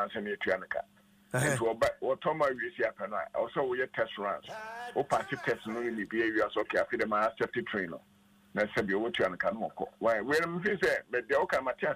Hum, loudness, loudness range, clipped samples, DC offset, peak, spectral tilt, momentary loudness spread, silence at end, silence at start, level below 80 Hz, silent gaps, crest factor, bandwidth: none; -32 LUFS; 3 LU; under 0.1%; under 0.1%; -16 dBFS; -5 dB/octave; 8 LU; 0 s; 0 s; -66 dBFS; none; 16 dB; 15.5 kHz